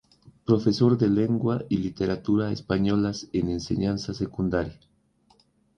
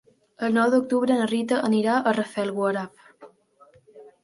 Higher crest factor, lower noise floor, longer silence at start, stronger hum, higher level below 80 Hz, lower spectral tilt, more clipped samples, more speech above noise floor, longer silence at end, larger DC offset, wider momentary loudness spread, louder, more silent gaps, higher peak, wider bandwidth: about the same, 20 dB vs 18 dB; first, -63 dBFS vs -57 dBFS; second, 0.25 s vs 0.4 s; neither; first, -48 dBFS vs -72 dBFS; first, -7.5 dB/octave vs -5.5 dB/octave; neither; first, 39 dB vs 34 dB; first, 1.05 s vs 0.15 s; neither; about the same, 8 LU vs 8 LU; about the same, -25 LUFS vs -23 LUFS; neither; about the same, -6 dBFS vs -8 dBFS; second, 8.8 kHz vs 11.5 kHz